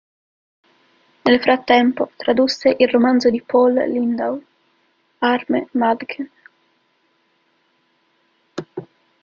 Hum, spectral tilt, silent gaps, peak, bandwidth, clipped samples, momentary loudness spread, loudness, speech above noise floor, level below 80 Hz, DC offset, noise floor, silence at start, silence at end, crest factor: none; -5 dB/octave; none; -2 dBFS; 7.2 kHz; under 0.1%; 17 LU; -17 LUFS; 47 dB; -60 dBFS; under 0.1%; -64 dBFS; 1.25 s; 0.4 s; 18 dB